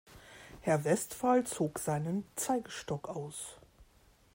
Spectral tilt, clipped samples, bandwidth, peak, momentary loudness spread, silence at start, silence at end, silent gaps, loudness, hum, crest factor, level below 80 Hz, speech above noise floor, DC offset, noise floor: -5 dB/octave; under 0.1%; 16.5 kHz; -16 dBFS; 15 LU; 0.1 s; 0.5 s; none; -34 LUFS; none; 18 dB; -66 dBFS; 31 dB; under 0.1%; -65 dBFS